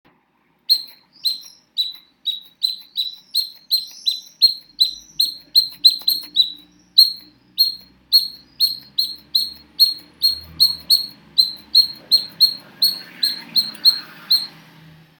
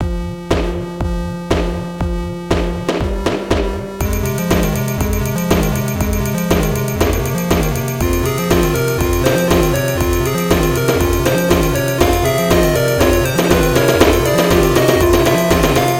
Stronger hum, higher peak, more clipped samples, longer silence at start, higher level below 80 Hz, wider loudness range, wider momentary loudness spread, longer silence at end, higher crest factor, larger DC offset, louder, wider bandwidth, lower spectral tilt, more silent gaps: neither; about the same, 0 dBFS vs 0 dBFS; neither; first, 0.7 s vs 0 s; second, -62 dBFS vs -24 dBFS; about the same, 6 LU vs 7 LU; first, 12 LU vs 8 LU; first, 0.7 s vs 0 s; first, 20 dB vs 14 dB; second, under 0.1% vs 0.1%; about the same, -17 LUFS vs -15 LUFS; first, over 20 kHz vs 17.5 kHz; second, 1 dB/octave vs -5.5 dB/octave; neither